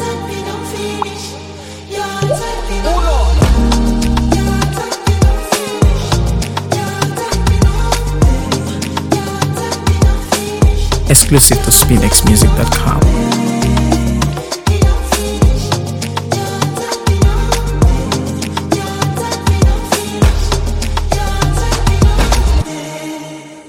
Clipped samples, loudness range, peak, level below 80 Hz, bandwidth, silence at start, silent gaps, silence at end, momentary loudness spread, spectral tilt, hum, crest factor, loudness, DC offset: 0.2%; 6 LU; 0 dBFS; -16 dBFS; 19 kHz; 0 s; none; 0 s; 12 LU; -4.5 dB/octave; none; 12 dB; -13 LUFS; under 0.1%